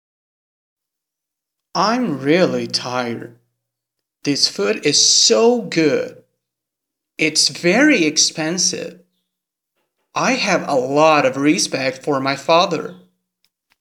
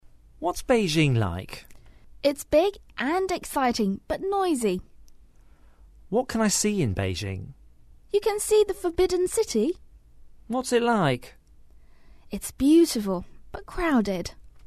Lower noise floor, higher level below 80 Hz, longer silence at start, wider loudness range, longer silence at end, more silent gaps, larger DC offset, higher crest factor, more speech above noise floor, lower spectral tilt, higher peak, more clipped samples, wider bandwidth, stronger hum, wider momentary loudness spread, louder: first, -83 dBFS vs -53 dBFS; second, -76 dBFS vs -46 dBFS; first, 1.75 s vs 0.4 s; first, 6 LU vs 3 LU; first, 0.85 s vs 0.05 s; neither; neither; about the same, 18 dB vs 18 dB; first, 66 dB vs 28 dB; second, -2.5 dB/octave vs -5 dB/octave; first, 0 dBFS vs -8 dBFS; neither; first, 16 kHz vs 13.5 kHz; neither; about the same, 14 LU vs 13 LU; first, -16 LUFS vs -25 LUFS